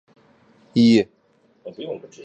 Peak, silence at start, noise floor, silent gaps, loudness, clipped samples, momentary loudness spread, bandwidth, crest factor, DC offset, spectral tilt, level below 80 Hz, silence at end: -4 dBFS; 0.75 s; -55 dBFS; none; -18 LUFS; under 0.1%; 24 LU; 8.4 kHz; 18 dB; under 0.1%; -6.5 dB/octave; -66 dBFS; 0.25 s